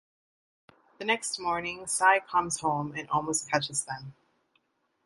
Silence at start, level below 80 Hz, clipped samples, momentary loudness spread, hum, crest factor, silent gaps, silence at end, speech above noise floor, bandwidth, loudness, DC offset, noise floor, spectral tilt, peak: 1 s; -66 dBFS; under 0.1%; 12 LU; none; 22 dB; none; 0.95 s; 44 dB; 11.5 kHz; -28 LUFS; under 0.1%; -73 dBFS; -2.5 dB/octave; -8 dBFS